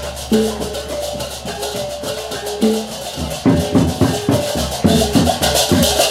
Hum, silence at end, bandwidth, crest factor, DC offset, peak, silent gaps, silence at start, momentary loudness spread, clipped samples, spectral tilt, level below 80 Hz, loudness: none; 0 s; 16.5 kHz; 16 dB; under 0.1%; 0 dBFS; none; 0 s; 10 LU; under 0.1%; -4.5 dB/octave; -32 dBFS; -17 LUFS